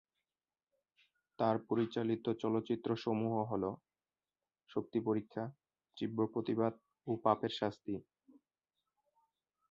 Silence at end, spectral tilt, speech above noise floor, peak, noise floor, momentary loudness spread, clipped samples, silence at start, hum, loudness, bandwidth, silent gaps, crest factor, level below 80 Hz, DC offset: 1.7 s; -6 dB/octave; over 54 dB; -16 dBFS; under -90 dBFS; 10 LU; under 0.1%; 1.4 s; none; -38 LUFS; 7.2 kHz; none; 22 dB; -74 dBFS; under 0.1%